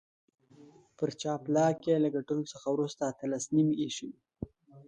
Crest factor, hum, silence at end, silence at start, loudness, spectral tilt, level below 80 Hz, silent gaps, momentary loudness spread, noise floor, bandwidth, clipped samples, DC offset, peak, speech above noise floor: 18 dB; none; 0.05 s; 0.6 s; -31 LUFS; -6 dB/octave; -66 dBFS; none; 18 LU; -58 dBFS; 9.4 kHz; under 0.1%; under 0.1%; -14 dBFS; 27 dB